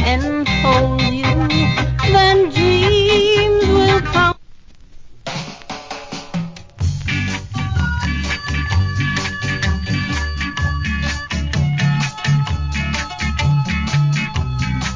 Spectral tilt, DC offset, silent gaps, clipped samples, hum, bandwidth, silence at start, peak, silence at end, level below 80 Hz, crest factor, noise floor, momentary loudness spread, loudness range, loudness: -5.5 dB/octave; under 0.1%; none; under 0.1%; none; 7.6 kHz; 0 s; -2 dBFS; 0 s; -26 dBFS; 16 dB; -39 dBFS; 13 LU; 9 LU; -17 LUFS